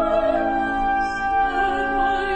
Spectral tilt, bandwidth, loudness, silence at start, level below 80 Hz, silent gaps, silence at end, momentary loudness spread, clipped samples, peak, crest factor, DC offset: -5 dB/octave; 8.8 kHz; -21 LUFS; 0 s; -38 dBFS; none; 0 s; 2 LU; under 0.1%; -10 dBFS; 12 dB; under 0.1%